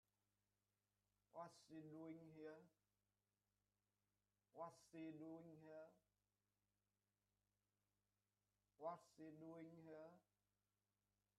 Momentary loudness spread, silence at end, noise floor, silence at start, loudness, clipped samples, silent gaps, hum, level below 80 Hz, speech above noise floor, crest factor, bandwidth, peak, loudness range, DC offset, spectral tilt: 8 LU; 1.15 s; under -90 dBFS; 1.35 s; -61 LUFS; under 0.1%; none; 50 Hz at -95 dBFS; under -90 dBFS; over 31 dB; 24 dB; 11 kHz; -40 dBFS; 2 LU; under 0.1%; -6.5 dB/octave